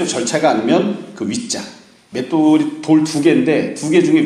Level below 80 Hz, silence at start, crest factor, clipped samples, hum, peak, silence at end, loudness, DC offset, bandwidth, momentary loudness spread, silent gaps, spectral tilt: -60 dBFS; 0 s; 14 dB; under 0.1%; none; 0 dBFS; 0 s; -16 LUFS; under 0.1%; 11.5 kHz; 11 LU; none; -5 dB/octave